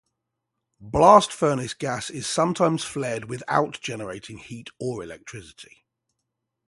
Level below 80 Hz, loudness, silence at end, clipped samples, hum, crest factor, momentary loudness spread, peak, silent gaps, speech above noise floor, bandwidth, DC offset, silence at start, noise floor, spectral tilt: -52 dBFS; -23 LUFS; 1.05 s; under 0.1%; none; 24 dB; 23 LU; 0 dBFS; none; 58 dB; 11.5 kHz; under 0.1%; 0.8 s; -81 dBFS; -4.5 dB/octave